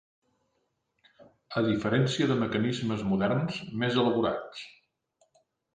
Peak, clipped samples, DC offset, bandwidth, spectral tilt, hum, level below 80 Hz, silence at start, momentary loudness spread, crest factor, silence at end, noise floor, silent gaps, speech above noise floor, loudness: -14 dBFS; under 0.1%; under 0.1%; 9.8 kHz; -6.5 dB/octave; none; -62 dBFS; 1.2 s; 10 LU; 18 dB; 1.05 s; -77 dBFS; none; 49 dB; -28 LUFS